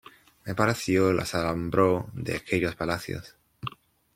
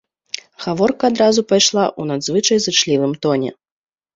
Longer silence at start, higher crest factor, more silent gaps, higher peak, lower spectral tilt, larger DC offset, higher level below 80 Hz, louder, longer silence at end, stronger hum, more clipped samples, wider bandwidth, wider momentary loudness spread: second, 0.45 s vs 0.6 s; first, 22 dB vs 16 dB; neither; second, -6 dBFS vs 0 dBFS; first, -5.5 dB/octave vs -3.5 dB/octave; neither; about the same, -54 dBFS vs -58 dBFS; second, -27 LUFS vs -16 LUFS; second, 0.45 s vs 0.65 s; neither; neither; first, 16.5 kHz vs 8 kHz; first, 16 LU vs 13 LU